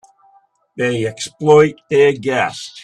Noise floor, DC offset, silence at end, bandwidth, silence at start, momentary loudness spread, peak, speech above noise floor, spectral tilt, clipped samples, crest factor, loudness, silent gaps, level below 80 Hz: -54 dBFS; under 0.1%; 0.05 s; 11 kHz; 0.75 s; 10 LU; 0 dBFS; 39 dB; -5 dB/octave; under 0.1%; 16 dB; -15 LUFS; none; -56 dBFS